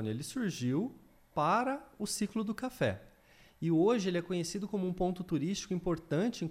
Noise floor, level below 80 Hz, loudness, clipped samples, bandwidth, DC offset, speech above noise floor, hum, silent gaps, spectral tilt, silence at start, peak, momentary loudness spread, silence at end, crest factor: -62 dBFS; -58 dBFS; -34 LUFS; under 0.1%; 16 kHz; under 0.1%; 29 dB; none; none; -5.5 dB/octave; 0 s; -18 dBFS; 8 LU; 0 s; 16 dB